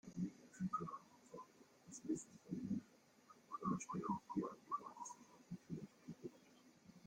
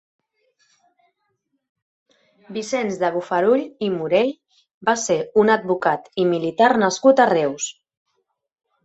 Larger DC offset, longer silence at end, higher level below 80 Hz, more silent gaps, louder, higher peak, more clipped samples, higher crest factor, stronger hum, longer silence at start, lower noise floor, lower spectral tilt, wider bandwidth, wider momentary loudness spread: neither; second, 0 s vs 1.15 s; second, -80 dBFS vs -66 dBFS; second, none vs 4.74-4.81 s; second, -49 LUFS vs -19 LUFS; second, -30 dBFS vs -2 dBFS; neither; about the same, 20 dB vs 20 dB; neither; second, 0.05 s vs 2.5 s; second, -69 dBFS vs -73 dBFS; first, -6.5 dB/octave vs -4.5 dB/octave; first, 16 kHz vs 8.2 kHz; first, 22 LU vs 10 LU